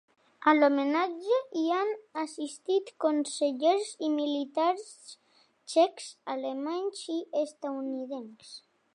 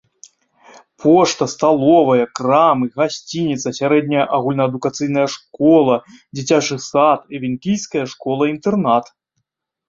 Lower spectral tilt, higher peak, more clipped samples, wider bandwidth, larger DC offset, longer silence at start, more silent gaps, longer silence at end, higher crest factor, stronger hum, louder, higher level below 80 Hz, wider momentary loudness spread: second, -2.5 dB/octave vs -5.5 dB/octave; second, -8 dBFS vs -2 dBFS; neither; first, 11 kHz vs 7.8 kHz; neither; second, 0.4 s vs 1 s; neither; second, 0.35 s vs 0.85 s; first, 22 dB vs 16 dB; neither; second, -30 LUFS vs -16 LUFS; second, -88 dBFS vs -60 dBFS; first, 15 LU vs 9 LU